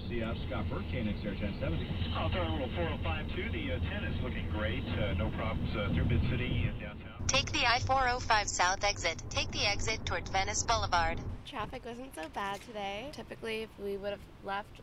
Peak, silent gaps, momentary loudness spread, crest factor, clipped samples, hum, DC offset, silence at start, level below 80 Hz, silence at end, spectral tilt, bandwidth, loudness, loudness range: -14 dBFS; none; 11 LU; 20 dB; under 0.1%; none; under 0.1%; 0 s; -44 dBFS; 0 s; -4 dB/octave; 12.5 kHz; -33 LUFS; 6 LU